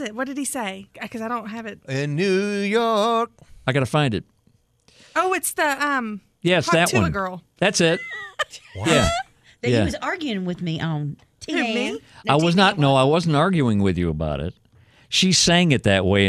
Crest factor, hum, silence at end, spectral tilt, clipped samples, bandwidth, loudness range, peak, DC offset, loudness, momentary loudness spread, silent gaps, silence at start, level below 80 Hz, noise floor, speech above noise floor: 20 dB; none; 0 s; -4.5 dB/octave; under 0.1%; 15 kHz; 4 LU; -2 dBFS; under 0.1%; -21 LUFS; 13 LU; none; 0 s; -44 dBFS; -62 dBFS; 41 dB